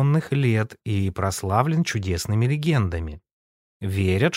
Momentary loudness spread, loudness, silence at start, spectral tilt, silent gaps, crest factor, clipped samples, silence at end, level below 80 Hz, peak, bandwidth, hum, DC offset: 7 LU; -23 LUFS; 0 s; -6 dB/octave; 3.33-3.80 s; 18 dB; under 0.1%; 0 s; -44 dBFS; -4 dBFS; 16 kHz; none; under 0.1%